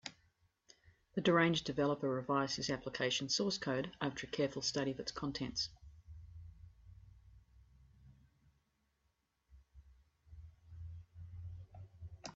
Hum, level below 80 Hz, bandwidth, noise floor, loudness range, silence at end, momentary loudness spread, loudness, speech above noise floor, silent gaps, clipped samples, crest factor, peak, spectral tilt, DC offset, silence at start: none; -64 dBFS; 8 kHz; -82 dBFS; 21 LU; 0 s; 23 LU; -37 LUFS; 45 dB; none; under 0.1%; 24 dB; -18 dBFS; -3.5 dB/octave; under 0.1%; 0.05 s